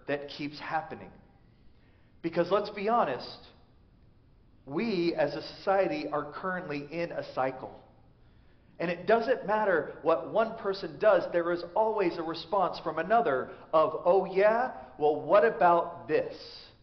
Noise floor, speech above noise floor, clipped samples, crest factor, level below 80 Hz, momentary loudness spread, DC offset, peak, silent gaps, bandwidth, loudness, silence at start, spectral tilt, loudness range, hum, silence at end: -59 dBFS; 31 dB; under 0.1%; 18 dB; -64 dBFS; 12 LU; under 0.1%; -12 dBFS; none; 6.2 kHz; -29 LUFS; 0.05 s; -4 dB/octave; 7 LU; none; 0.15 s